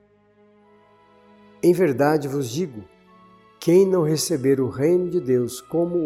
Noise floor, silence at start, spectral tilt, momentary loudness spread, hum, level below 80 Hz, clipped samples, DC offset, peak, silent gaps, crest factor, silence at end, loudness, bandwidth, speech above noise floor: -57 dBFS; 1.65 s; -6 dB/octave; 10 LU; none; -62 dBFS; under 0.1%; under 0.1%; -6 dBFS; none; 16 dB; 0 s; -21 LUFS; 15.5 kHz; 37 dB